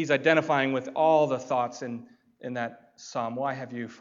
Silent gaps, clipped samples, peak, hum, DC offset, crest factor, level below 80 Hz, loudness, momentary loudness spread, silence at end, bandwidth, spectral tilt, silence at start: none; under 0.1%; -6 dBFS; none; under 0.1%; 20 dB; -82 dBFS; -27 LUFS; 15 LU; 0.05 s; 7.6 kHz; -5.5 dB/octave; 0 s